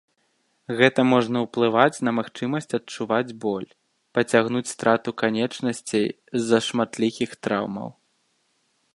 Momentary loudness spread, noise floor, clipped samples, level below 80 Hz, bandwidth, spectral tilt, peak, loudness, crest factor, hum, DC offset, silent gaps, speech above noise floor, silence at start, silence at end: 10 LU; -69 dBFS; under 0.1%; -68 dBFS; 11.5 kHz; -5 dB/octave; 0 dBFS; -23 LUFS; 24 dB; none; under 0.1%; none; 46 dB; 0.7 s; 1.05 s